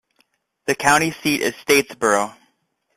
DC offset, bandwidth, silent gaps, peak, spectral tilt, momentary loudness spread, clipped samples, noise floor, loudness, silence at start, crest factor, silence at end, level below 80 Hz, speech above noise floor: under 0.1%; 15.5 kHz; none; -2 dBFS; -3 dB/octave; 9 LU; under 0.1%; -68 dBFS; -19 LUFS; 0.65 s; 20 dB; 0.65 s; -58 dBFS; 49 dB